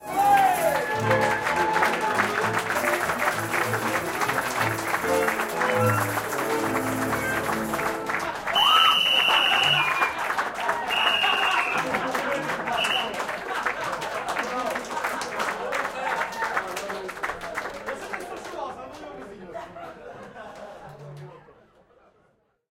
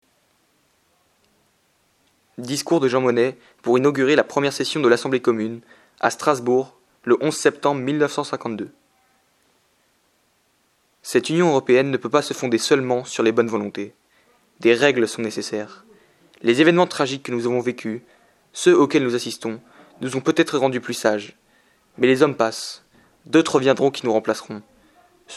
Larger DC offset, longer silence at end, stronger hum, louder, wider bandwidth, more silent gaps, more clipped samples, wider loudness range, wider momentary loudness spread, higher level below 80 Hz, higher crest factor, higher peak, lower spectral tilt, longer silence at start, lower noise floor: neither; first, 1.2 s vs 0 s; neither; second, -24 LUFS vs -20 LUFS; first, 17 kHz vs 13.5 kHz; neither; neither; first, 16 LU vs 5 LU; first, 20 LU vs 15 LU; first, -56 dBFS vs -72 dBFS; about the same, 20 dB vs 22 dB; second, -6 dBFS vs 0 dBFS; second, -3 dB/octave vs -4.5 dB/octave; second, 0 s vs 2.4 s; about the same, -66 dBFS vs -64 dBFS